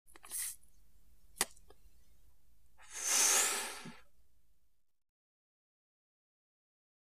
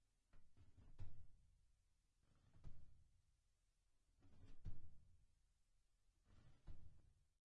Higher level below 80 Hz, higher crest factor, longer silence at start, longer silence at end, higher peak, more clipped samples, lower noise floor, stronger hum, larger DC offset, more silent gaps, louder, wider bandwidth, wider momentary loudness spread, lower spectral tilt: second, -72 dBFS vs -66 dBFS; first, 30 dB vs 18 dB; about the same, 0.25 s vs 0.35 s; first, 2.05 s vs 0.3 s; first, -10 dBFS vs -38 dBFS; neither; second, -72 dBFS vs -84 dBFS; neither; first, 0.2% vs under 0.1%; neither; first, -33 LUFS vs -66 LUFS; first, 15.5 kHz vs 4.8 kHz; first, 22 LU vs 6 LU; second, 1.5 dB/octave vs -7.5 dB/octave